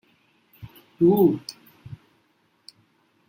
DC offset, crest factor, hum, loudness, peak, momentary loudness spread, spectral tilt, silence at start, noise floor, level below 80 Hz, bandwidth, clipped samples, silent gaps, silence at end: under 0.1%; 20 dB; none; -20 LUFS; -8 dBFS; 27 LU; -8.5 dB/octave; 0.6 s; -66 dBFS; -64 dBFS; 16.5 kHz; under 0.1%; none; 1.35 s